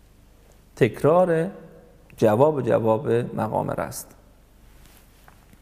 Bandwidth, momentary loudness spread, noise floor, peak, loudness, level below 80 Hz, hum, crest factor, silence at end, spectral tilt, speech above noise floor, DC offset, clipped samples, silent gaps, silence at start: 15.5 kHz; 13 LU; -52 dBFS; -4 dBFS; -22 LUFS; -54 dBFS; none; 20 dB; 1.6 s; -7 dB/octave; 31 dB; under 0.1%; under 0.1%; none; 0.75 s